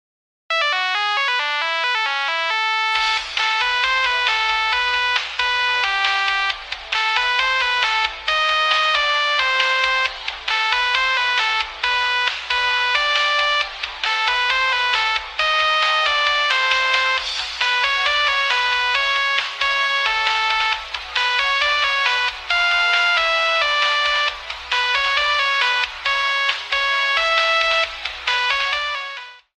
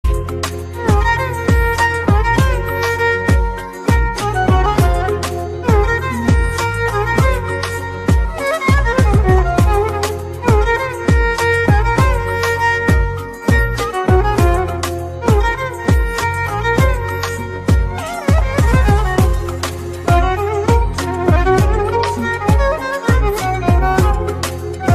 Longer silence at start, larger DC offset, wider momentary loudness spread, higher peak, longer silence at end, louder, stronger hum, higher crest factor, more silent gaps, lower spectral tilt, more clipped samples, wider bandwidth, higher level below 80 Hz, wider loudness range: first, 0.5 s vs 0.05 s; neither; second, 4 LU vs 7 LU; about the same, -2 dBFS vs -2 dBFS; first, 0.2 s vs 0 s; about the same, -17 LUFS vs -16 LUFS; neither; first, 18 dB vs 12 dB; neither; second, 1.5 dB/octave vs -6 dB/octave; neither; about the same, 13.5 kHz vs 14.5 kHz; second, -50 dBFS vs -20 dBFS; about the same, 1 LU vs 2 LU